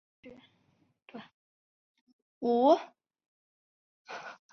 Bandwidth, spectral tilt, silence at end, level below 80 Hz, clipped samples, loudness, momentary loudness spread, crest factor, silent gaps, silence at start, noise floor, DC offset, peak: 6.6 kHz; -5.5 dB/octave; 0.2 s; -84 dBFS; under 0.1%; -27 LUFS; 26 LU; 22 dB; 1.34-1.95 s, 2.01-2.07 s, 2.13-2.41 s, 3.28-4.05 s; 0.25 s; -72 dBFS; under 0.1%; -12 dBFS